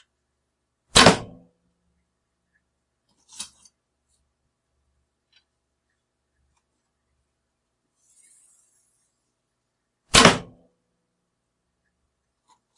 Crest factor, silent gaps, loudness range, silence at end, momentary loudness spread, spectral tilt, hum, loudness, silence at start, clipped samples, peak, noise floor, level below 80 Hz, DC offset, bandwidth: 28 dB; none; 24 LU; 2.35 s; 24 LU; -2.5 dB/octave; 60 Hz at -60 dBFS; -16 LUFS; 0.95 s; under 0.1%; 0 dBFS; -78 dBFS; -48 dBFS; under 0.1%; 12 kHz